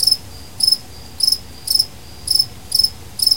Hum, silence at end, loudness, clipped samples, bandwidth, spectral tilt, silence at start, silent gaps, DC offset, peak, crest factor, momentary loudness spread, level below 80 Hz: none; 0 s; -16 LUFS; under 0.1%; 17 kHz; 0 dB/octave; 0 s; none; 1%; -2 dBFS; 18 dB; 6 LU; -44 dBFS